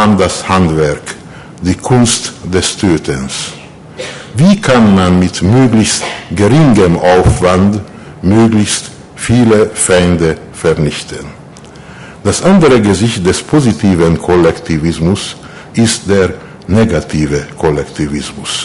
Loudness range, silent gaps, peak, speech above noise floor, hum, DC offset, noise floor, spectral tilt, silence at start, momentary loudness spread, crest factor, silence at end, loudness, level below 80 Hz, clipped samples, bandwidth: 4 LU; none; 0 dBFS; 23 dB; none; under 0.1%; -32 dBFS; -5.5 dB/octave; 0 s; 14 LU; 10 dB; 0 s; -10 LUFS; -28 dBFS; under 0.1%; 11.5 kHz